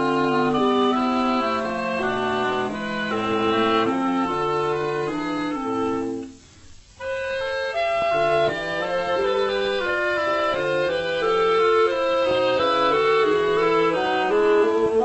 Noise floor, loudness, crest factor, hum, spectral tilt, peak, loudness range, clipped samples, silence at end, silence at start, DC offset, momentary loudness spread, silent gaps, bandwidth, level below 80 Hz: -46 dBFS; -22 LUFS; 14 dB; none; -5 dB/octave; -8 dBFS; 6 LU; under 0.1%; 0 s; 0 s; under 0.1%; 7 LU; none; 8.4 kHz; -52 dBFS